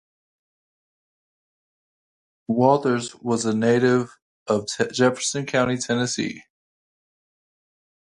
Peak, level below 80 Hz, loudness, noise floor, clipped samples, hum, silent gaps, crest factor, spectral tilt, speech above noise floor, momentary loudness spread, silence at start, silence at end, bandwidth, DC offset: -2 dBFS; -64 dBFS; -22 LUFS; under -90 dBFS; under 0.1%; none; 4.22-4.46 s; 22 dB; -4.5 dB/octave; over 69 dB; 11 LU; 2.5 s; 1.65 s; 11 kHz; under 0.1%